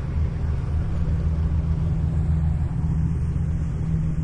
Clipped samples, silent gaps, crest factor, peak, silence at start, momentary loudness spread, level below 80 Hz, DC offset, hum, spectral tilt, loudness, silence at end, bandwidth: under 0.1%; none; 12 dB; -12 dBFS; 0 s; 3 LU; -28 dBFS; under 0.1%; none; -9.5 dB/octave; -25 LUFS; 0 s; 6 kHz